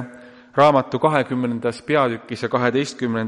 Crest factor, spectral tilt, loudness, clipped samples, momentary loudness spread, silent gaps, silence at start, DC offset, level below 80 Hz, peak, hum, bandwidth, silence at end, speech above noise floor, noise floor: 18 dB; -6 dB/octave; -20 LUFS; under 0.1%; 10 LU; none; 0 s; under 0.1%; -62 dBFS; -2 dBFS; none; 11.5 kHz; 0 s; 24 dB; -43 dBFS